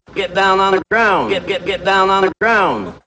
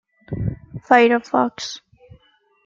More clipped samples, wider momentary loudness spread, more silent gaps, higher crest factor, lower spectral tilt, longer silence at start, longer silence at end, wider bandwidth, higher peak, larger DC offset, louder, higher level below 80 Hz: neither; second, 6 LU vs 20 LU; neither; second, 14 dB vs 20 dB; about the same, -4.5 dB/octave vs -5.5 dB/octave; second, 0.1 s vs 0.3 s; second, 0.1 s vs 0.9 s; first, 8.8 kHz vs 7.6 kHz; about the same, -2 dBFS vs -2 dBFS; neither; first, -14 LUFS vs -19 LUFS; about the same, -46 dBFS vs -46 dBFS